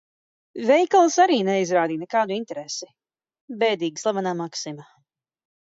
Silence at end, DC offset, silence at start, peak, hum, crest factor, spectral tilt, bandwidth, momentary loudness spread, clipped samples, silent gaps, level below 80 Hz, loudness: 0.95 s; under 0.1%; 0.55 s; -6 dBFS; none; 18 dB; -4 dB/octave; 7.8 kHz; 15 LU; under 0.1%; 3.41-3.48 s; -78 dBFS; -22 LUFS